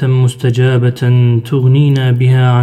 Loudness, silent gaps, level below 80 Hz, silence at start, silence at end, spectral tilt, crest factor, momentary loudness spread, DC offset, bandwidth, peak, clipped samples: -11 LUFS; none; -50 dBFS; 0 s; 0 s; -8 dB/octave; 8 dB; 3 LU; under 0.1%; 9.4 kHz; 0 dBFS; under 0.1%